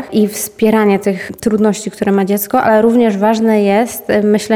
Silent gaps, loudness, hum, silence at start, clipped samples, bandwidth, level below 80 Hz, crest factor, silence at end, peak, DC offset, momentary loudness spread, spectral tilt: none; -13 LUFS; none; 0 s; under 0.1%; 17.5 kHz; -50 dBFS; 10 dB; 0 s; -2 dBFS; under 0.1%; 6 LU; -5.5 dB/octave